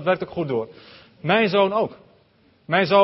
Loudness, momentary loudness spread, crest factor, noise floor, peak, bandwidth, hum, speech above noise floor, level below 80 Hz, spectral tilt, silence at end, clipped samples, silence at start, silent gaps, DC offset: -22 LUFS; 11 LU; 18 dB; -59 dBFS; -4 dBFS; 5.8 kHz; none; 38 dB; -62 dBFS; -9.5 dB/octave; 0 s; under 0.1%; 0 s; none; under 0.1%